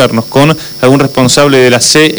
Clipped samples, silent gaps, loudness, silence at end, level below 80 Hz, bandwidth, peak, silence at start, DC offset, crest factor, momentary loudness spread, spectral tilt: 0.9%; none; -6 LUFS; 0 s; -40 dBFS; over 20 kHz; 0 dBFS; 0 s; under 0.1%; 6 dB; 4 LU; -4 dB/octave